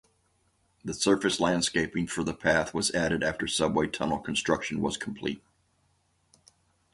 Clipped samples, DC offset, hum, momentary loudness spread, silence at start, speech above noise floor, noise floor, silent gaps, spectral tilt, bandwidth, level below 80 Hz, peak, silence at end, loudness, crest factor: under 0.1%; under 0.1%; none; 9 LU; 0.85 s; 42 dB; -70 dBFS; none; -3.5 dB/octave; 11.5 kHz; -54 dBFS; -10 dBFS; 1.55 s; -28 LUFS; 20 dB